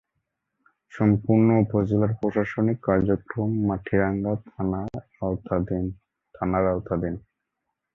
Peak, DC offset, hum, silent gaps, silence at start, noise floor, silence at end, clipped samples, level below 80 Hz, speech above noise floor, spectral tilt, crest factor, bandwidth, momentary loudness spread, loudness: -6 dBFS; under 0.1%; none; none; 0.95 s; -81 dBFS; 0.75 s; under 0.1%; -46 dBFS; 58 dB; -11 dB/octave; 18 dB; 3.8 kHz; 11 LU; -25 LUFS